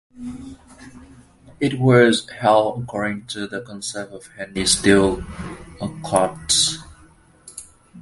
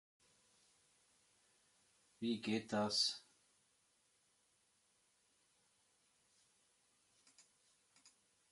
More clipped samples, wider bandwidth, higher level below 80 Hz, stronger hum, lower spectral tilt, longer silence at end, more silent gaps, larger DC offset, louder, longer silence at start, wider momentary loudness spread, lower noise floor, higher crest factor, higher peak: neither; about the same, 11.5 kHz vs 11.5 kHz; first, -44 dBFS vs -86 dBFS; second, none vs 50 Hz at -85 dBFS; about the same, -4 dB/octave vs -3.5 dB/octave; second, 0 s vs 1.1 s; neither; neither; first, -19 LUFS vs -39 LUFS; second, 0.15 s vs 2.2 s; first, 21 LU vs 10 LU; second, -51 dBFS vs -79 dBFS; about the same, 22 dB vs 24 dB; first, 0 dBFS vs -26 dBFS